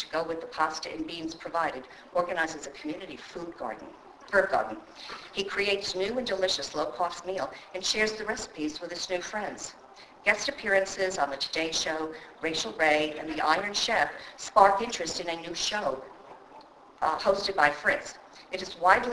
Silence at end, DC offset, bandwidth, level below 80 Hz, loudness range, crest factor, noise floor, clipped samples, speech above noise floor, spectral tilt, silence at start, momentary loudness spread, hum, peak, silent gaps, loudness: 0 s; under 0.1%; 11 kHz; -60 dBFS; 6 LU; 26 dB; -52 dBFS; under 0.1%; 22 dB; -2 dB/octave; 0 s; 15 LU; none; -4 dBFS; none; -29 LUFS